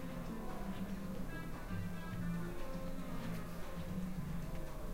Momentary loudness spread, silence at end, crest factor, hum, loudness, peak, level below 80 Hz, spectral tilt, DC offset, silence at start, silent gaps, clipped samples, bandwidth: 4 LU; 0 s; 12 dB; none; -45 LUFS; -30 dBFS; -48 dBFS; -6.5 dB/octave; under 0.1%; 0 s; none; under 0.1%; 16 kHz